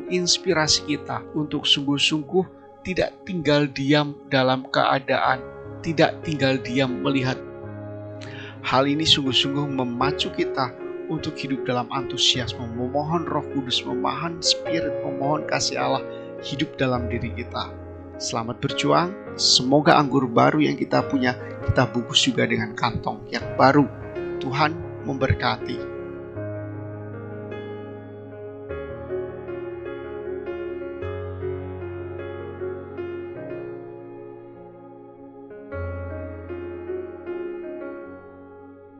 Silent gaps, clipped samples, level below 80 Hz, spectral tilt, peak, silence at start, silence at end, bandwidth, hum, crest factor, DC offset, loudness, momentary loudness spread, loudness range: none; under 0.1%; -50 dBFS; -4 dB/octave; 0 dBFS; 0 s; 0 s; 9.2 kHz; none; 24 dB; under 0.1%; -23 LUFS; 17 LU; 14 LU